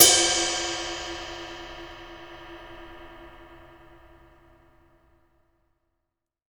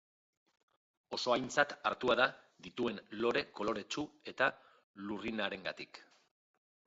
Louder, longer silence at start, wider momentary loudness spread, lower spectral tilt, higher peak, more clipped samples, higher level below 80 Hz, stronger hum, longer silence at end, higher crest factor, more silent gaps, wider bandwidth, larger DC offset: first, -24 LUFS vs -36 LUFS; second, 0 s vs 1.1 s; first, 25 LU vs 16 LU; second, 0 dB/octave vs -1.5 dB/octave; first, 0 dBFS vs -14 dBFS; neither; first, -54 dBFS vs -72 dBFS; neither; first, 3 s vs 0.85 s; first, 30 dB vs 24 dB; second, none vs 4.83-4.94 s; first, over 20 kHz vs 7.6 kHz; neither